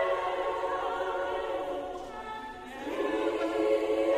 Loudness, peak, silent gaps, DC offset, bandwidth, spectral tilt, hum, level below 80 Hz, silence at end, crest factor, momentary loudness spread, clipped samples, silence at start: -32 LUFS; -16 dBFS; none; under 0.1%; 15 kHz; -4.5 dB/octave; none; -58 dBFS; 0 s; 16 dB; 12 LU; under 0.1%; 0 s